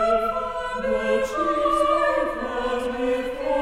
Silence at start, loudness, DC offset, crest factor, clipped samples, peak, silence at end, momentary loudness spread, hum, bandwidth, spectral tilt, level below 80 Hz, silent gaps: 0 s; -23 LUFS; under 0.1%; 14 dB; under 0.1%; -8 dBFS; 0 s; 7 LU; none; 15 kHz; -4.5 dB/octave; -44 dBFS; none